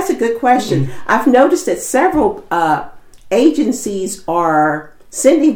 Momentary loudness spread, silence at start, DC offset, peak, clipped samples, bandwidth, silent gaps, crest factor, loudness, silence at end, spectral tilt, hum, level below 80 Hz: 9 LU; 0 s; under 0.1%; 0 dBFS; under 0.1%; over 20 kHz; none; 14 dB; -14 LUFS; 0 s; -5 dB/octave; none; -44 dBFS